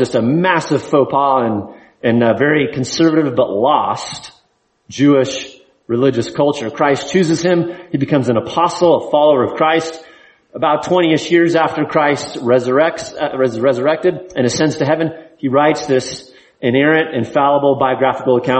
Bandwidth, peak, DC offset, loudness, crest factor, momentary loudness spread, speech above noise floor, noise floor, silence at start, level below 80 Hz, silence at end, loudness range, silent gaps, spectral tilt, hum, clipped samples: 8.8 kHz; 0 dBFS; under 0.1%; -15 LUFS; 14 dB; 9 LU; 46 dB; -60 dBFS; 0 s; -54 dBFS; 0 s; 2 LU; none; -5.5 dB/octave; none; under 0.1%